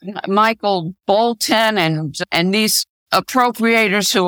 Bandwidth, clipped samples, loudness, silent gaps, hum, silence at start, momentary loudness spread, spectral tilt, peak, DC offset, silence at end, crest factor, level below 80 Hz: over 20 kHz; under 0.1%; -16 LUFS; 2.89-3.06 s; none; 0.05 s; 5 LU; -3.5 dB/octave; -2 dBFS; under 0.1%; 0 s; 16 dB; -60 dBFS